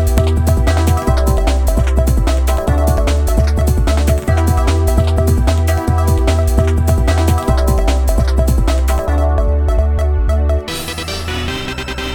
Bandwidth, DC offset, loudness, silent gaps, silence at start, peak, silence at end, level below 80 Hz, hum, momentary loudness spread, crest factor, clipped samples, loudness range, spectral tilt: 18.5 kHz; under 0.1%; -15 LUFS; none; 0 s; 0 dBFS; 0 s; -14 dBFS; none; 5 LU; 12 dB; under 0.1%; 2 LU; -6 dB/octave